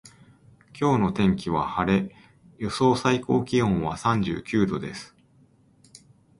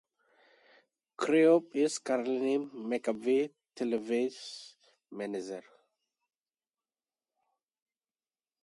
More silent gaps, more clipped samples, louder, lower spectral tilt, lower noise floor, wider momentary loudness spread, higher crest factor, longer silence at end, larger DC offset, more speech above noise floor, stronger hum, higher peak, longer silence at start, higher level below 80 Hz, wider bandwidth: neither; neither; first, -24 LUFS vs -31 LUFS; first, -6.5 dB/octave vs -4.5 dB/octave; second, -59 dBFS vs under -90 dBFS; second, 10 LU vs 18 LU; about the same, 18 dB vs 20 dB; second, 1.35 s vs 3 s; neither; second, 35 dB vs over 60 dB; neither; first, -6 dBFS vs -14 dBFS; second, 0.05 s vs 1.2 s; first, -50 dBFS vs -84 dBFS; about the same, 11.5 kHz vs 11.5 kHz